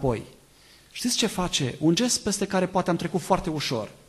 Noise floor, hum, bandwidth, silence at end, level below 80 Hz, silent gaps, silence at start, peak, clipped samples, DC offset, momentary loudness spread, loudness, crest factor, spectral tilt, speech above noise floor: -54 dBFS; none; 13 kHz; 0.1 s; -48 dBFS; none; 0 s; -8 dBFS; under 0.1%; under 0.1%; 6 LU; -25 LUFS; 18 dB; -4 dB/octave; 29 dB